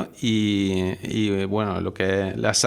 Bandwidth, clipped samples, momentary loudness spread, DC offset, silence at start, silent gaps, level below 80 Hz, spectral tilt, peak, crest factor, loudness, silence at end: 15.5 kHz; under 0.1%; 4 LU; under 0.1%; 0 s; none; -56 dBFS; -4.5 dB/octave; -4 dBFS; 18 dB; -24 LUFS; 0 s